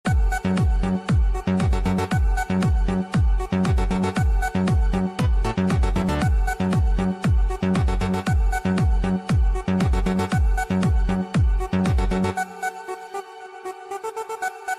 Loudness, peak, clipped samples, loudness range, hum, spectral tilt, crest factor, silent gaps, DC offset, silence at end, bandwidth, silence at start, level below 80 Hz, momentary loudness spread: -23 LUFS; -12 dBFS; under 0.1%; 2 LU; none; -7 dB/octave; 10 dB; none; under 0.1%; 0 s; 13.5 kHz; 0.05 s; -24 dBFS; 8 LU